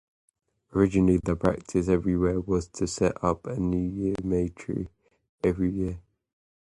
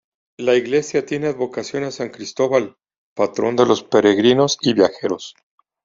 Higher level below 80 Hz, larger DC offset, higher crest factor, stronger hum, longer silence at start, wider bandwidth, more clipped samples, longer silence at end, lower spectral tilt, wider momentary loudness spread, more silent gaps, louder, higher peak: first, -44 dBFS vs -62 dBFS; neither; about the same, 20 dB vs 18 dB; neither; first, 0.75 s vs 0.4 s; first, 11.5 kHz vs 7.6 kHz; neither; first, 0.75 s vs 0.55 s; first, -7.5 dB/octave vs -4.5 dB/octave; second, 10 LU vs 13 LU; second, 5.29-5.38 s vs 2.98-3.16 s; second, -27 LUFS vs -18 LUFS; second, -8 dBFS vs -2 dBFS